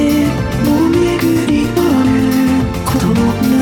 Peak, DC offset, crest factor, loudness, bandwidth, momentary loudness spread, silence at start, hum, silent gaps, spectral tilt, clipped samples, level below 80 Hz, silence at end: -2 dBFS; under 0.1%; 10 dB; -13 LUFS; 19.5 kHz; 4 LU; 0 s; none; none; -6 dB/octave; under 0.1%; -30 dBFS; 0 s